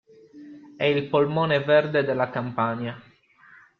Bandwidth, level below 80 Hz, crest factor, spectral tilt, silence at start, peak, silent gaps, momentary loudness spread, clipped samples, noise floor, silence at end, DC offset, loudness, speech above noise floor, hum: 6 kHz; -64 dBFS; 18 dB; -8.5 dB/octave; 0.35 s; -8 dBFS; none; 10 LU; under 0.1%; -54 dBFS; 0.8 s; under 0.1%; -23 LUFS; 31 dB; none